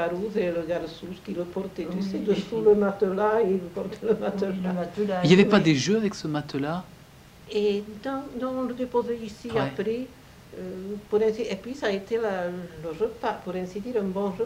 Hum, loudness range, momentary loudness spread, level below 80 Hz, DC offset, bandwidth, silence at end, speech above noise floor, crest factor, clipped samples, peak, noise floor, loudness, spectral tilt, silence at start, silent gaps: none; 7 LU; 13 LU; -56 dBFS; under 0.1%; 15.5 kHz; 0 s; 24 dB; 22 dB; under 0.1%; -4 dBFS; -50 dBFS; -26 LUFS; -6 dB/octave; 0 s; none